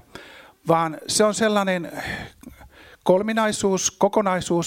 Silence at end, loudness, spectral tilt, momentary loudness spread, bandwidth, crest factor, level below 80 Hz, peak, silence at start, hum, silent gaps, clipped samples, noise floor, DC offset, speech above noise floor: 0 s; -21 LUFS; -4 dB/octave; 14 LU; 16.5 kHz; 18 dB; -54 dBFS; -4 dBFS; 0.15 s; none; none; under 0.1%; -48 dBFS; under 0.1%; 27 dB